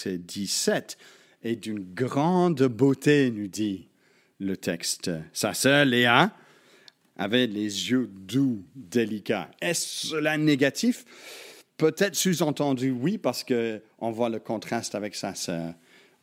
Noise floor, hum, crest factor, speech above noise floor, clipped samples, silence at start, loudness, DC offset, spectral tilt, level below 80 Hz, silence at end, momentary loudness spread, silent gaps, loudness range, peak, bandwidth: -56 dBFS; none; 24 dB; 31 dB; under 0.1%; 0 s; -26 LUFS; under 0.1%; -4.5 dB/octave; -72 dBFS; 0.5 s; 13 LU; none; 4 LU; -2 dBFS; 16.5 kHz